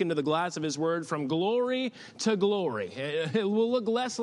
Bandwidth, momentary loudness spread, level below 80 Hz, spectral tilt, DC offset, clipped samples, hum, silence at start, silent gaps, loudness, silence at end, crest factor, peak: 11.5 kHz; 5 LU; -78 dBFS; -5 dB/octave; under 0.1%; under 0.1%; none; 0 s; none; -29 LUFS; 0 s; 14 dB; -14 dBFS